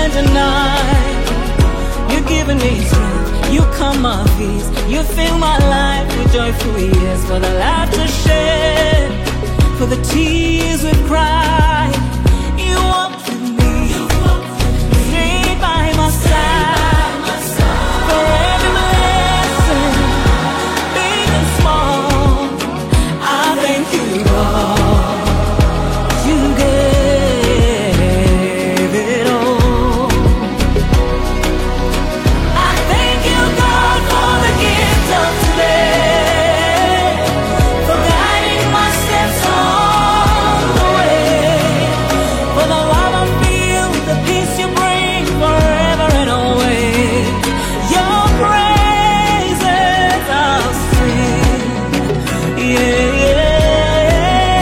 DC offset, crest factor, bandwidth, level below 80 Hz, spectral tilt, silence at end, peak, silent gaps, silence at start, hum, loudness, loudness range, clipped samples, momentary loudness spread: under 0.1%; 12 dB; 16.5 kHz; -18 dBFS; -5 dB/octave; 0 s; 0 dBFS; none; 0 s; none; -13 LUFS; 3 LU; under 0.1%; 5 LU